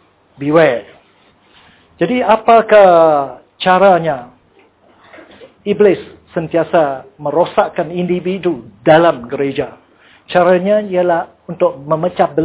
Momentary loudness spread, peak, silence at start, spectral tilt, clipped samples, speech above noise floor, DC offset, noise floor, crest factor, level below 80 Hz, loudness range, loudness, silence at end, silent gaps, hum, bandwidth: 14 LU; 0 dBFS; 0.4 s; -10 dB/octave; under 0.1%; 38 dB; under 0.1%; -50 dBFS; 14 dB; -52 dBFS; 5 LU; -13 LUFS; 0 s; none; none; 4 kHz